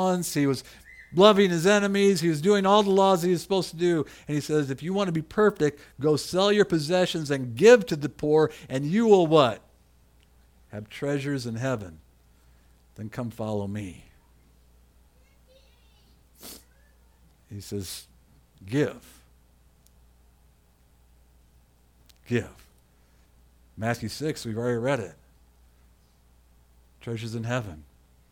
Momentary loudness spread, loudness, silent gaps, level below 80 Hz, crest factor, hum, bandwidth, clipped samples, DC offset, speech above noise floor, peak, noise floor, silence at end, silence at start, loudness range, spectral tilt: 21 LU; -24 LUFS; none; -58 dBFS; 26 dB; 60 Hz at -55 dBFS; 17.5 kHz; under 0.1%; under 0.1%; 36 dB; -2 dBFS; -60 dBFS; 0.5 s; 0 s; 17 LU; -5.5 dB/octave